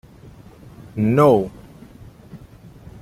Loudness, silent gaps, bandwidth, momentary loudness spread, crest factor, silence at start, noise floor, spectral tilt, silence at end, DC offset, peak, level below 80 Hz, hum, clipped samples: -17 LUFS; none; 15.5 kHz; 28 LU; 20 dB; 0.95 s; -44 dBFS; -8.5 dB/octave; 0.05 s; under 0.1%; -2 dBFS; -50 dBFS; none; under 0.1%